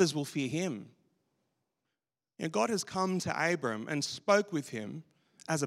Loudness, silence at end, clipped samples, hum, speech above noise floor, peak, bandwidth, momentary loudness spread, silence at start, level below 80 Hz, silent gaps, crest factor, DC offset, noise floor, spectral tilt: -33 LUFS; 0 s; under 0.1%; none; 57 dB; -12 dBFS; 16 kHz; 13 LU; 0 s; -78 dBFS; none; 22 dB; under 0.1%; -90 dBFS; -4.5 dB/octave